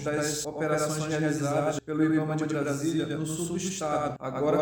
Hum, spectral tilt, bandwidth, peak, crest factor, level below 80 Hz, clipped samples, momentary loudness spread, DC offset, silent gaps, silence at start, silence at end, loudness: none; -5 dB/octave; over 20 kHz; -14 dBFS; 14 dB; -60 dBFS; under 0.1%; 5 LU; under 0.1%; none; 0 s; 0 s; -29 LUFS